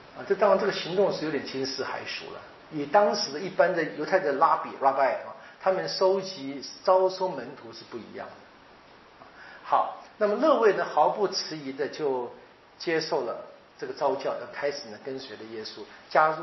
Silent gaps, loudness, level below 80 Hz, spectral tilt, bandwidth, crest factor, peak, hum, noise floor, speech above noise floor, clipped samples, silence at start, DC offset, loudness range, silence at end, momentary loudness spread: none; -27 LUFS; -72 dBFS; -2.5 dB/octave; 6.2 kHz; 20 dB; -8 dBFS; none; -53 dBFS; 26 dB; under 0.1%; 0 s; under 0.1%; 6 LU; 0 s; 18 LU